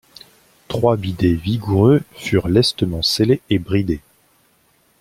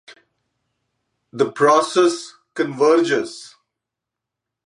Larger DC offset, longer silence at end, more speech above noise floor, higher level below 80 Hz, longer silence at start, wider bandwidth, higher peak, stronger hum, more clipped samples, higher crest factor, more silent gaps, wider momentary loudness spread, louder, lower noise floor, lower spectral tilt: neither; second, 1 s vs 1.2 s; second, 42 dB vs 67 dB; first, -42 dBFS vs -76 dBFS; first, 0.7 s vs 0.1 s; first, 16 kHz vs 11.5 kHz; about the same, -2 dBFS vs -2 dBFS; neither; neither; about the same, 16 dB vs 18 dB; neither; second, 6 LU vs 18 LU; about the same, -18 LUFS vs -18 LUFS; second, -59 dBFS vs -84 dBFS; first, -6 dB/octave vs -4 dB/octave